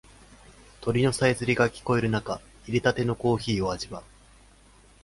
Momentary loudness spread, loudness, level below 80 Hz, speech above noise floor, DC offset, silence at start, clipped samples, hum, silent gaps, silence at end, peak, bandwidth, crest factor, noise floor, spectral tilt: 12 LU; -26 LUFS; -50 dBFS; 30 dB; under 0.1%; 0.8 s; under 0.1%; none; none; 1.05 s; -8 dBFS; 11.5 kHz; 20 dB; -55 dBFS; -5.5 dB/octave